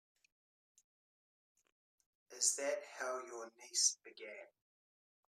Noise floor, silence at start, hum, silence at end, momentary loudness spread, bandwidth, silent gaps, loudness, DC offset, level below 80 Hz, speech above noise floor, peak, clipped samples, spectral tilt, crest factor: under -90 dBFS; 2.3 s; none; 0.9 s; 18 LU; 14 kHz; none; -37 LUFS; under 0.1%; under -90 dBFS; over 49 dB; -18 dBFS; under 0.1%; 2.5 dB/octave; 26 dB